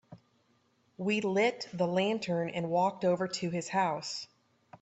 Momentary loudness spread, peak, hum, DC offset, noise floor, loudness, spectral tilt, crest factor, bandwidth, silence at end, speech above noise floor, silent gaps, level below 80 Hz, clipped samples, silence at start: 8 LU; -16 dBFS; none; under 0.1%; -71 dBFS; -31 LUFS; -5 dB/octave; 16 dB; 8.2 kHz; 0.05 s; 40 dB; none; -76 dBFS; under 0.1%; 0.1 s